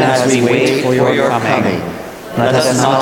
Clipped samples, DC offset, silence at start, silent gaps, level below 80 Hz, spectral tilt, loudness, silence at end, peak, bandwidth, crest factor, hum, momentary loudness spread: under 0.1%; under 0.1%; 0 s; none; -50 dBFS; -5 dB/octave; -13 LUFS; 0 s; 0 dBFS; 17.5 kHz; 12 dB; none; 10 LU